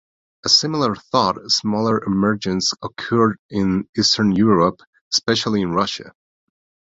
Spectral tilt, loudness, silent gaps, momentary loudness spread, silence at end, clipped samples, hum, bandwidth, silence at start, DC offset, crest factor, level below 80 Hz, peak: -4 dB/octave; -18 LUFS; 3.39-3.49 s, 3.89-3.93 s, 4.87-4.93 s, 5.01-5.11 s; 7 LU; 0.75 s; under 0.1%; none; 7.8 kHz; 0.45 s; under 0.1%; 18 dB; -50 dBFS; -2 dBFS